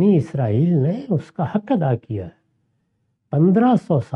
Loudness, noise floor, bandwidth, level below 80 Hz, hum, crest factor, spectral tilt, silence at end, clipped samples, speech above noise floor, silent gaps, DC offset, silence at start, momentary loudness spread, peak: -19 LUFS; -69 dBFS; 6.4 kHz; -58 dBFS; none; 14 dB; -10 dB/octave; 0 s; under 0.1%; 51 dB; none; under 0.1%; 0 s; 10 LU; -6 dBFS